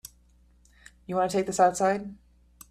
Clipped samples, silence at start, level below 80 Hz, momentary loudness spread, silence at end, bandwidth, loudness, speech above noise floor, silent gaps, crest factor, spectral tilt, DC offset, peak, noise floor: under 0.1%; 1.1 s; -60 dBFS; 23 LU; 0.55 s; 15 kHz; -26 LUFS; 35 dB; none; 20 dB; -4.5 dB/octave; under 0.1%; -8 dBFS; -60 dBFS